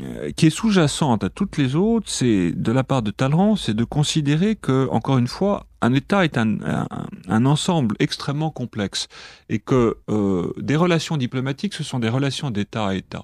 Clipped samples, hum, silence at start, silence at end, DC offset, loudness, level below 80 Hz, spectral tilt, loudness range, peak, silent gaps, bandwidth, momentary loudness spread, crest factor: under 0.1%; none; 0 s; 0 s; under 0.1%; -21 LUFS; -48 dBFS; -6 dB/octave; 3 LU; -2 dBFS; none; 13.5 kHz; 7 LU; 18 dB